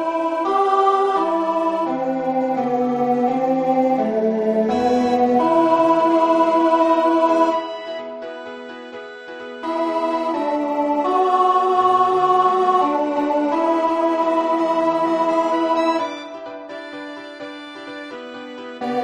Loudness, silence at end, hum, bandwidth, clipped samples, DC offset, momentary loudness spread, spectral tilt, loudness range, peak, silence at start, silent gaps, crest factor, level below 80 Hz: -18 LUFS; 0 s; none; 10.5 kHz; under 0.1%; under 0.1%; 17 LU; -6 dB/octave; 7 LU; -4 dBFS; 0 s; none; 14 dB; -62 dBFS